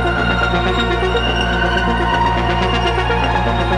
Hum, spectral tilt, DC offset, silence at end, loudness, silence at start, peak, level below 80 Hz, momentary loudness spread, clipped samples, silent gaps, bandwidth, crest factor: none; -6 dB/octave; under 0.1%; 0 s; -16 LUFS; 0 s; -6 dBFS; -22 dBFS; 1 LU; under 0.1%; none; 10 kHz; 10 dB